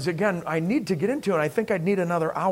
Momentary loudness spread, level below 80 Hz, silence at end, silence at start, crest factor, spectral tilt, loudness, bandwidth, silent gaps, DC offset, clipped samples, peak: 2 LU; -62 dBFS; 0 s; 0 s; 14 dB; -6.5 dB/octave; -25 LUFS; 16 kHz; none; under 0.1%; under 0.1%; -10 dBFS